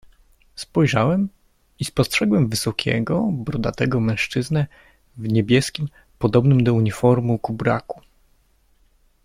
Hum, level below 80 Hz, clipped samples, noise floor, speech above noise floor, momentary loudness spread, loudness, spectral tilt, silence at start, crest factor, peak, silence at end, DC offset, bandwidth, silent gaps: none; -46 dBFS; under 0.1%; -60 dBFS; 40 dB; 12 LU; -20 LUFS; -6 dB/octave; 0.55 s; 18 dB; -4 dBFS; 1.25 s; under 0.1%; 15.5 kHz; none